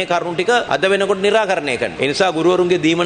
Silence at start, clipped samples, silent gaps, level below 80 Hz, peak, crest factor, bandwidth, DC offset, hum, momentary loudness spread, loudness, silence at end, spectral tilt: 0 s; under 0.1%; none; -52 dBFS; -2 dBFS; 14 dB; 9.8 kHz; under 0.1%; none; 4 LU; -16 LUFS; 0 s; -4.5 dB/octave